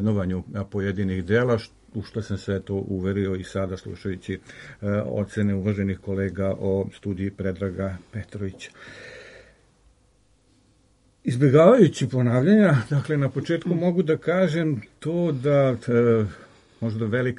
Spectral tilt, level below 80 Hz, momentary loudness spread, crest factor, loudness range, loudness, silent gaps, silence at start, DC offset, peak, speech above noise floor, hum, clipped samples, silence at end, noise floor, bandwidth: -8 dB/octave; -56 dBFS; 16 LU; 20 dB; 13 LU; -23 LUFS; none; 0 s; under 0.1%; -4 dBFS; 39 dB; none; under 0.1%; 0 s; -61 dBFS; 11.5 kHz